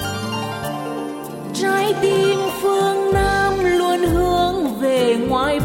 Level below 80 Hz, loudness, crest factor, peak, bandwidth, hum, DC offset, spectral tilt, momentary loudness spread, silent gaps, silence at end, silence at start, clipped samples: -36 dBFS; -19 LUFS; 12 dB; -6 dBFS; 16.5 kHz; none; under 0.1%; -5 dB/octave; 9 LU; none; 0 s; 0 s; under 0.1%